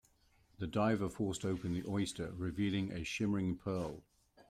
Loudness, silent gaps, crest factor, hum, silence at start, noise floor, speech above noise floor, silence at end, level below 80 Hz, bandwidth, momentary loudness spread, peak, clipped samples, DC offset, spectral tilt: -38 LUFS; none; 16 dB; none; 0.6 s; -70 dBFS; 33 dB; 0.1 s; -62 dBFS; 14.5 kHz; 7 LU; -22 dBFS; under 0.1%; under 0.1%; -6 dB/octave